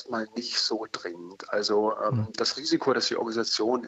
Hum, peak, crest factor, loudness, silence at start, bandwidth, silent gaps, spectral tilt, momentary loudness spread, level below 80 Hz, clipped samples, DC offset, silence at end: none; -12 dBFS; 16 dB; -27 LUFS; 0 s; 8.2 kHz; none; -4 dB/octave; 9 LU; -74 dBFS; under 0.1%; under 0.1%; 0 s